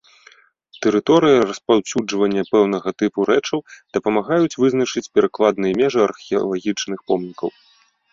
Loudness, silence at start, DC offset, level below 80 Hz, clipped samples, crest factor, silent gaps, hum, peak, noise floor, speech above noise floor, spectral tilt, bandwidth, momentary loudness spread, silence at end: -19 LUFS; 0.75 s; under 0.1%; -58 dBFS; under 0.1%; 16 dB; none; none; -2 dBFS; -51 dBFS; 33 dB; -5 dB/octave; 7.6 kHz; 8 LU; 0.65 s